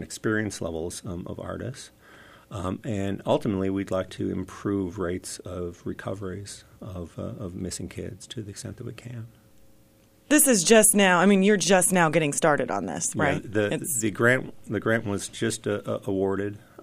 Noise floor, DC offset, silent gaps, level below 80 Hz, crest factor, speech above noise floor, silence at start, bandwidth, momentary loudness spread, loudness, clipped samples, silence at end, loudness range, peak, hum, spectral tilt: -58 dBFS; under 0.1%; none; -56 dBFS; 20 dB; 32 dB; 0 s; 15.5 kHz; 19 LU; -24 LUFS; under 0.1%; 0 s; 16 LU; -6 dBFS; none; -4 dB/octave